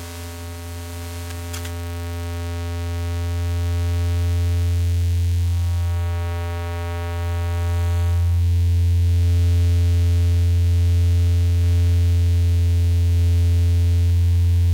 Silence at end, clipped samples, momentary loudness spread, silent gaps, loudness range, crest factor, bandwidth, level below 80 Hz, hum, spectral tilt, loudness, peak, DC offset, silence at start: 0 s; under 0.1%; 11 LU; none; 7 LU; 6 dB; 16 kHz; -32 dBFS; none; -6.5 dB/octave; -20 LUFS; -12 dBFS; under 0.1%; 0 s